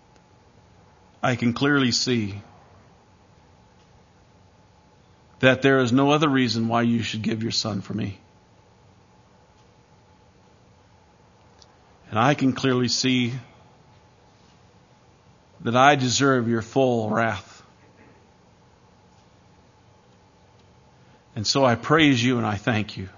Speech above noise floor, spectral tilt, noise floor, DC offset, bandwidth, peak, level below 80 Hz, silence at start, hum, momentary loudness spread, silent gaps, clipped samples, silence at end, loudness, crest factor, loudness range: 34 dB; -5 dB/octave; -55 dBFS; under 0.1%; 7.4 kHz; 0 dBFS; -62 dBFS; 1.25 s; none; 11 LU; none; under 0.1%; 0.05 s; -21 LUFS; 24 dB; 10 LU